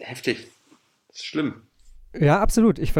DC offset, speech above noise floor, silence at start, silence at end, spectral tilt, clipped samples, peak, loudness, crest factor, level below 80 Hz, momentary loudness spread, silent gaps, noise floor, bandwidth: under 0.1%; 39 dB; 0 s; 0 s; -6 dB/octave; under 0.1%; -6 dBFS; -22 LUFS; 16 dB; -34 dBFS; 19 LU; none; -60 dBFS; 16.5 kHz